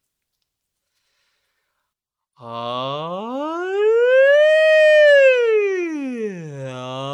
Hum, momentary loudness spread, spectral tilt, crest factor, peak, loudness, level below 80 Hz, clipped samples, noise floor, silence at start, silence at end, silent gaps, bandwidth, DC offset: none; 18 LU; -4.5 dB/octave; 14 dB; -4 dBFS; -15 LUFS; -82 dBFS; under 0.1%; -82 dBFS; 2.4 s; 0 s; none; 8.6 kHz; under 0.1%